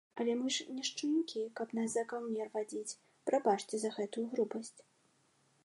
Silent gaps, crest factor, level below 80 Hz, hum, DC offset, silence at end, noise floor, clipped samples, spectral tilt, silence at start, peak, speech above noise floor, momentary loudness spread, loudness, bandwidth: none; 20 dB; -90 dBFS; none; under 0.1%; 0.85 s; -73 dBFS; under 0.1%; -3.5 dB/octave; 0.15 s; -18 dBFS; 36 dB; 9 LU; -37 LUFS; 11.5 kHz